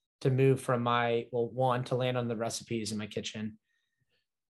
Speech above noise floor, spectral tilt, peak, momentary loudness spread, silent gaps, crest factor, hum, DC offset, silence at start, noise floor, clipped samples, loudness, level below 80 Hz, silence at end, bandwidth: 49 dB; -5.5 dB/octave; -14 dBFS; 10 LU; none; 18 dB; none; under 0.1%; 0.2 s; -80 dBFS; under 0.1%; -31 LUFS; -72 dBFS; 0.95 s; 12.5 kHz